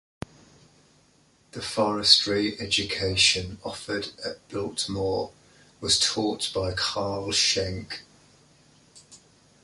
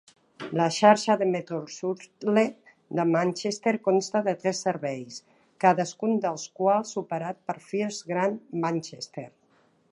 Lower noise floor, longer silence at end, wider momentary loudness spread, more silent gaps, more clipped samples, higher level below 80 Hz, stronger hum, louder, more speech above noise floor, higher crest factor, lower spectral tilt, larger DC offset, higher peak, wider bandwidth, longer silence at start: about the same, -61 dBFS vs -64 dBFS; second, 0.45 s vs 0.65 s; first, 18 LU vs 13 LU; neither; neither; first, -50 dBFS vs -78 dBFS; neither; about the same, -24 LUFS vs -26 LUFS; about the same, 35 dB vs 38 dB; about the same, 26 dB vs 22 dB; second, -2.5 dB/octave vs -5 dB/octave; neither; about the same, -2 dBFS vs -4 dBFS; about the same, 11.5 kHz vs 11.5 kHz; first, 1.55 s vs 0.4 s